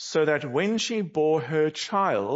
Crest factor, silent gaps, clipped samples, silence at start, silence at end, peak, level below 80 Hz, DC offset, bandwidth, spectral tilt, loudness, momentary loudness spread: 14 dB; none; under 0.1%; 0 s; 0 s; -10 dBFS; -74 dBFS; under 0.1%; 8 kHz; -4.5 dB/octave; -25 LUFS; 2 LU